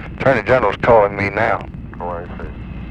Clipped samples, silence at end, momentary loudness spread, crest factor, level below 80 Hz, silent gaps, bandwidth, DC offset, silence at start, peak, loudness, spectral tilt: under 0.1%; 0 s; 18 LU; 16 dB; -34 dBFS; none; 8.6 kHz; under 0.1%; 0 s; 0 dBFS; -16 LUFS; -7.5 dB/octave